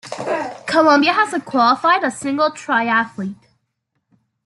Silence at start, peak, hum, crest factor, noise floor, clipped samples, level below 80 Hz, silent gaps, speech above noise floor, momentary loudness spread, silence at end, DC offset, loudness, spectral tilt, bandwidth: 0.05 s; -2 dBFS; none; 16 dB; -72 dBFS; under 0.1%; -66 dBFS; none; 56 dB; 11 LU; 1.1 s; under 0.1%; -17 LUFS; -4 dB/octave; 12 kHz